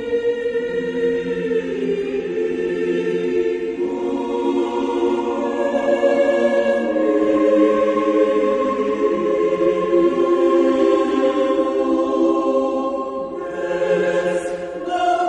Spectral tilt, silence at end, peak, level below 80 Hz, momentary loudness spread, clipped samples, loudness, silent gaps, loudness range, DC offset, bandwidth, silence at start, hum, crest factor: -6 dB/octave; 0 s; -4 dBFS; -54 dBFS; 7 LU; under 0.1%; -19 LUFS; none; 4 LU; under 0.1%; 9.8 kHz; 0 s; none; 14 dB